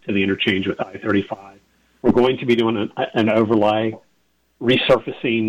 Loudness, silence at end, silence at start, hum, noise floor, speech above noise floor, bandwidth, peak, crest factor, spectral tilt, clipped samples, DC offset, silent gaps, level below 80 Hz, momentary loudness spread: -19 LUFS; 0 s; 0.05 s; none; -65 dBFS; 46 dB; 8.8 kHz; -6 dBFS; 14 dB; -7 dB/octave; under 0.1%; under 0.1%; none; -52 dBFS; 9 LU